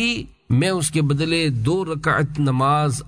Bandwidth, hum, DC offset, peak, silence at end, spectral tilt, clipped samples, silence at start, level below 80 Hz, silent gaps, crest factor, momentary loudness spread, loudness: 11 kHz; none; under 0.1%; -6 dBFS; 0 s; -5.5 dB/octave; under 0.1%; 0 s; -44 dBFS; none; 12 dB; 4 LU; -20 LUFS